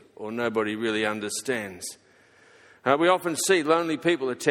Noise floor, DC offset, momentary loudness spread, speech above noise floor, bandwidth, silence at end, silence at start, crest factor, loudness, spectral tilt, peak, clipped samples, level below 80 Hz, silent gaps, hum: -57 dBFS; under 0.1%; 12 LU; 32 dB; 17 kHz; 0 s; 0.2 s; 20 dB; -25 LUFS; -3.5 dB/octave; -6 dBFS; under 0.1%; -70 dBFS; none; none